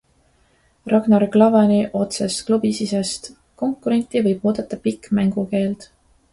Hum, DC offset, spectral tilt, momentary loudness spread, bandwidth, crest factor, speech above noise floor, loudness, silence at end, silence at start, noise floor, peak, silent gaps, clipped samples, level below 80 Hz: none; under 0.1%; -6 dB/octave; 12 LU; 11.5 kHz; 18 dB; 41 dB; -19 LUFS; 0.5 s; 0.85 s; -59 dBFS; 0 dBFS; none; under 0.1%; -54 dBFS